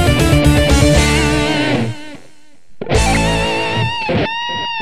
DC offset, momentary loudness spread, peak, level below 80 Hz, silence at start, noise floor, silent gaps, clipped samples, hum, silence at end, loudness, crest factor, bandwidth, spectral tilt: 3%; 8 LU; 0 dBFS; -22 dBFS; 0 s; -48 dBFS; none; under 0.1%; none; 0 s; -14 LUFS; 14 dB; 14 kHz; -5 dB/octave